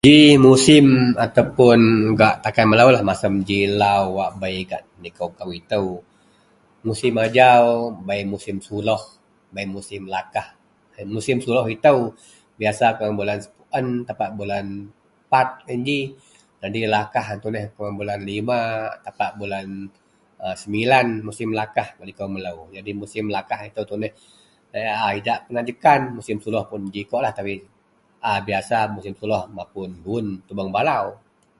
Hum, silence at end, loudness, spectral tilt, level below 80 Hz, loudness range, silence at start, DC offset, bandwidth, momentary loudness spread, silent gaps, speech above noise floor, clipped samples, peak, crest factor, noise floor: none; 0.45 s; -19 LUFS; -5.5 dB/octave; -52 dBFS; 11 LU; 0.05 s; under 0.1%; 11.5 kHz; 18 LU; none; 41 dB; under 0.1%; 0 dBFS; 20 dB; -60 dBFS